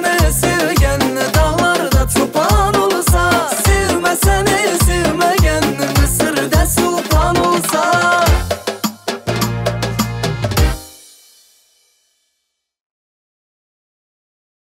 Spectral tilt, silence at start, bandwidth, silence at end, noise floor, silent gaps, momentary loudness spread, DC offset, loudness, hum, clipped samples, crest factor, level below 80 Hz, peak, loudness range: -4.5 dB/octave; 0 s; 16.5 kHz; 3.85 s; -72 dBFS; none; 6 LU; under 0.1%; -14 LUFS; none; under 0.1%; 12 dB; -22 dBFS; -4 dBFS; 8 LU